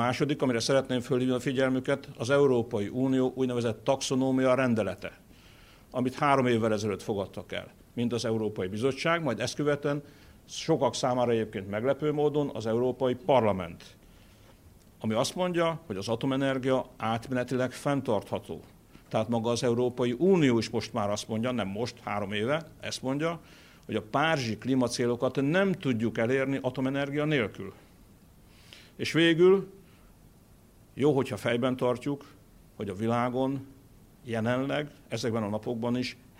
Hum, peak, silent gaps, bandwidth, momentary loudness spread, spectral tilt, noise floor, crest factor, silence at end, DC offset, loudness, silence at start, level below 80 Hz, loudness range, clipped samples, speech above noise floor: none; -10 dBFS; none; 16 kHz; 11 LU; -5.5 dB/octave; -57 dBFS; 20 dB; 0.25 s; under 0.1%; -29 LUFS; 0 s; -62 dBFS; 4 LU; under 0.1%; 29 dB